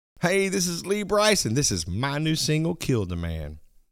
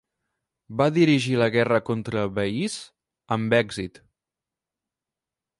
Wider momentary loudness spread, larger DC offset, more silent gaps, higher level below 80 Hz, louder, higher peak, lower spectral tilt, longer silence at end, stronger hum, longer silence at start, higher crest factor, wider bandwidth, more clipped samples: second, 10 LU vs 14 LU; neither; neither; first, -44 dBFS vs -58 dBFS; about the same, -24 LUFS vs -23 LUFS; about the same, -6 dBFS vs -6 dBFS; second, -4 dB/octave vs -6 dB/octave; second, 0.3 s vs 1.7 s; neither; second, 0.2 s vs 0.7 s; about the same, 20 dB vs 20 dB; first, over 20 kHz vs 11.5 kHz; neither